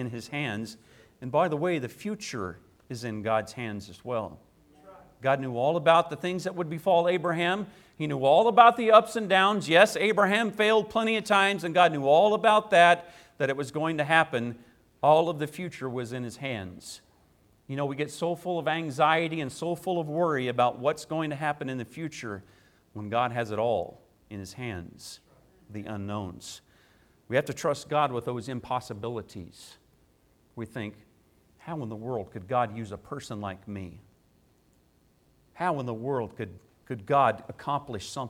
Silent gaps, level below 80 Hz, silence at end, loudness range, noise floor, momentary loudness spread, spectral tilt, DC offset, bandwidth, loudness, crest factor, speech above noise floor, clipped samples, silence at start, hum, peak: none; -66 dBFS; 0 s; 14 LU; -65 dBFS; 19 LU; -5 dB/octave; under 0.1%; 16 kHz; -26 LUFS; 24 dB; 38 dB; under 0.1%; 0 s; none; -4 dBFS